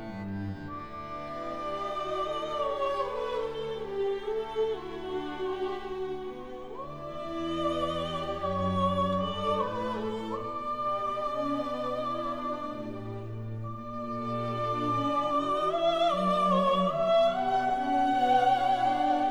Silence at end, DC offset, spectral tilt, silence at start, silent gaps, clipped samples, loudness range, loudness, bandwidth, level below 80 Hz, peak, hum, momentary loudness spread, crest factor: 0 s; 0.4%; -6.5 dB/octave; 0 s; none; under 0.1%; 8 LU; -30 LUFS; 20 kHz; -54 dBFS; -14 dBFS; none; 13 LU; 16 dB